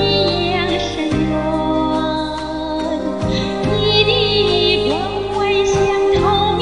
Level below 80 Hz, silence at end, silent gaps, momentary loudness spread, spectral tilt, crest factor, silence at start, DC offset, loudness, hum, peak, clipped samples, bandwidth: -34 dBFS; 0 s; none; 7 LU; -5 dB/octave; 16 dB; 0 s; 0.6%; -16 LUFS; none; 0 dBFS; under 0.1%; 10.5 kHz